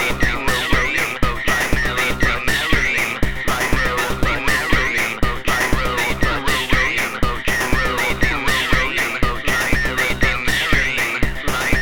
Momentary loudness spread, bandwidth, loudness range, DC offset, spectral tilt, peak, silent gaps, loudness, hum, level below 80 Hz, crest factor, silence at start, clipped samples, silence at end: 4 LU; 18.5 kHz; 1 LU; 2%; -3.5 dB/octave; 0 dBFS; none; -18 LUFS; none; -26 dBFS; 18 dB; 0 s; under 0.1%; 0 s